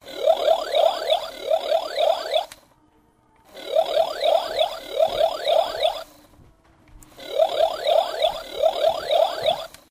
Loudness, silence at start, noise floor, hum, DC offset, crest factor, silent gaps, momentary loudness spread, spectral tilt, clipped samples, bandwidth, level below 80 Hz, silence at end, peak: -22 LUFS; 0.05 s; -59 dBFS; none; under 0.1%; 16 dB; none; 5 LU; -2 dB/octave; under 0.1%; 16 kHz; -56 dBFS; 0.25 s; -6 dBFS